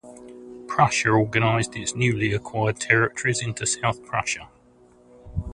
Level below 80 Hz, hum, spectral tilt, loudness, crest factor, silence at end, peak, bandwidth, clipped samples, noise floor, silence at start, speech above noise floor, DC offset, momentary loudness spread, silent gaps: -46 dBFS; none; -4.5 dB/octave; -23 LUFS; 22 dB; 0 s; -2 dBFS; 11 kHz; under 0.1%; -54 dBFS; 0.05 s; 32 dB; under 0.1%; 15 LU; none